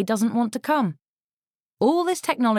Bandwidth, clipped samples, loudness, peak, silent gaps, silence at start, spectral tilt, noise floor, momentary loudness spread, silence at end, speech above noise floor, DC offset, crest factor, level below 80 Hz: 16 kHz; under 0.1%; -23 LUFS; -8 dBFS; 1.08-1.17 s, 1.24-1.59 s; 0 s; -5 dB/octave; under -90 dBFS; 3 LU; 0 s; over 68 dB; under 0.1%; 16 dB; -70 dBFS